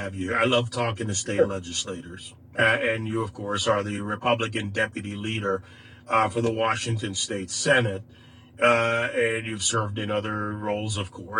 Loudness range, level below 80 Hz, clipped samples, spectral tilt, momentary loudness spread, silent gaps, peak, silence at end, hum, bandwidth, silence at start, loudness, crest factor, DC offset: 2 LU; -58 dBFS; under 0.1%; -4 dB/octave; 9 LU; none; -6 dBFS; 0 s; none; 10.5 kHz; 0 s; -25 LUFS; 20 dB; under 0.1%